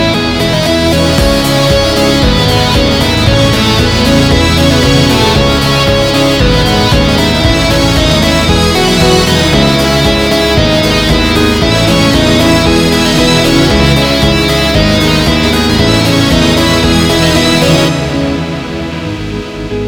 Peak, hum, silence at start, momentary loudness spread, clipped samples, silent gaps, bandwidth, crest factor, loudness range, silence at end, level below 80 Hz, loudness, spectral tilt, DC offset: 0 dBFS; none; 0 s; 3 LU; 0.4%; none; over 20 kHz; 8 dB; 1 LU; 0 s; -18 dBFS; -8 LUFS; -4.5 dB/octave; 0.2%